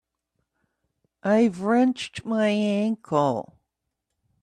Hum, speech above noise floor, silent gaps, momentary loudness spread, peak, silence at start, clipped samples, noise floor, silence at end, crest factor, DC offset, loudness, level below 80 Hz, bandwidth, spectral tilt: none; 59 dB; none; 9 LU; -8 dBFS; 1.25 s; under 0.1%; -81 dBFS; 1 s; 18 dB; under 0.1%; -24 LUFS; -68 dBFS; 10.5 kHz; -6.5 dB/octave